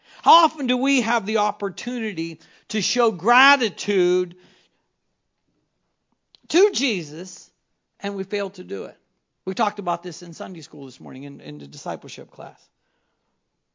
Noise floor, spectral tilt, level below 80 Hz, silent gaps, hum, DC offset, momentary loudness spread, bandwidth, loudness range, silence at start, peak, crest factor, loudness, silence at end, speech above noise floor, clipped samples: -74 dBFS; -3.5 dB/octave; -80 dBFS; none; none; under 0.1%; 22 LU; 7.6 kHz; 11 LU; 0.25 s; 0 dBFS; 24 dB; -21 LUFS; 1.25 s; 52 dB; under 0.1%